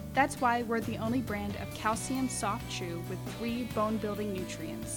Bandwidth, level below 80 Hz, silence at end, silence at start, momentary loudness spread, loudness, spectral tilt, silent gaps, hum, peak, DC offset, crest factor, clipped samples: 19 kHz; -52 dBFS; 0 s; 0 s; 8 LU; -33 LUFS; -4.5 dB/octave; none; none; -12 dBFS; under 0.1%; 20 dB; under 0.1%